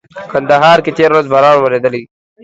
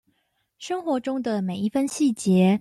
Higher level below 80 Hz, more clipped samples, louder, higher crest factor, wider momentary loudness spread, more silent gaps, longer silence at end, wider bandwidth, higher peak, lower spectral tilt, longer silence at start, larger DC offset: first, -54 dBFS vs -66 dBFS; first, 0.4% vs under 0.1%; first, -10 LUFS vs -24 LUFS; about the same, 10 dB vs 14 dB; about the same, 10 LU vs 10 LU; neither; first, 0.4 s vs 0 s; second, 8.2 kHz vs 12.5 kHz; first, 0 dBFS vs -10 dBFS; about the same, -5.5 dB/octave vs -6.5 dB/octave; second, 0.15 s vs 0.6 s; neither